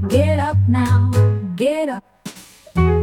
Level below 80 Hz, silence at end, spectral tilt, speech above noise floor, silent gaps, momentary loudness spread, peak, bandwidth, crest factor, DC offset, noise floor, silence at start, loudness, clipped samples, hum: -36 dBFS; 0 s; -7.5 dB/octave; 22 dB; none; 18 LU; -4 dBFS; 13 kHz; 14 dB; under 0.1%; -37 dBFS; 0 s; -17 LUFS; under 0.1%; none